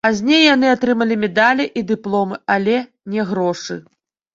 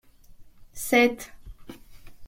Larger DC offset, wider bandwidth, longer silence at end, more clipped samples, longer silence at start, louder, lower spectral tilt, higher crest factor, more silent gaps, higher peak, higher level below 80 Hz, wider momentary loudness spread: neither; second, 7.8 kHz vs 16.5 kHz; first, 0.55 s vs 0 s; neither; second, 0.05 s vs 0.4 s; first, -16 LUFS vs -23 LUFS; first, -4.5 dB/octave vs -3 dB/octave; second, 16 dB vs 22 dB; neither; first, -2 dBFS vs -6 dBFS; second, -60 dBFS vs -50 dBFS; second, 12 LU vs 26 LU